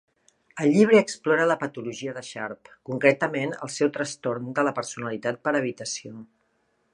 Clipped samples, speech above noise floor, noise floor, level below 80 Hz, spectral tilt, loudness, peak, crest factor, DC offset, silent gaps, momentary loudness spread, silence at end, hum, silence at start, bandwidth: under 0.1%; 45 dB; -70 dBFS; -74 dBFS; -5 dB/octave; -25 LUFS; -4 dBFS; 20 dB; under 0.1%; none; 15 LU; 0.7 s; none; 0.55 s; 11 kHz